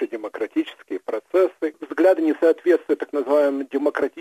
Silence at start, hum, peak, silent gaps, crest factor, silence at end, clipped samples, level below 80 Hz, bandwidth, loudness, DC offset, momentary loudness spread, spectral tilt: 0 s; none; -6 dBFS; none; 14 dB; 0 s; under 0.1%; -74 dBFS; 13.5 kHz; -21 LUFS; under 0.1%; 11 LU; -5 dB/octave